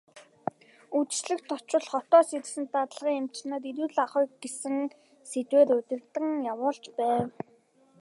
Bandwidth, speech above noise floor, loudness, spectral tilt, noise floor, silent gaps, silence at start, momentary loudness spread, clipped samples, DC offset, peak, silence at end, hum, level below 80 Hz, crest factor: 11.5 kHz; 35 dB; -29 LUFS; -4 dB/octave; -63 dBFS; none; 0.15 s; 15 LU; under 0.1%; under 0.1%; -8 dBFS; 0.7 s; none; -78 dBFS; 20 dB